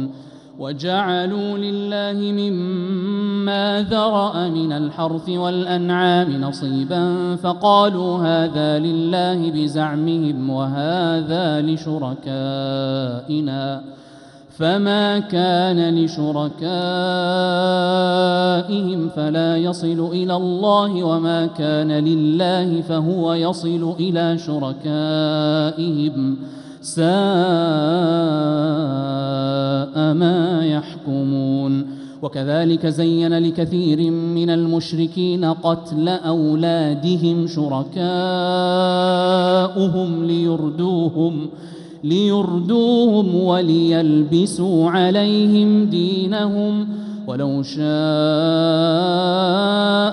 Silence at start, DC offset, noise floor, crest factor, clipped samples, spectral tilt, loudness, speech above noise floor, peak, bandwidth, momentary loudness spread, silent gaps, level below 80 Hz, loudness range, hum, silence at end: 0 s; under 0.1%; -43 dBFS; 16 dB; under 0.1%; -7 dB/octave; -18 LUFS; 25 dB; -2 dBFS; 11 kHz; 7 LU; none; -62 dBFS; 4 LU; none; 0 s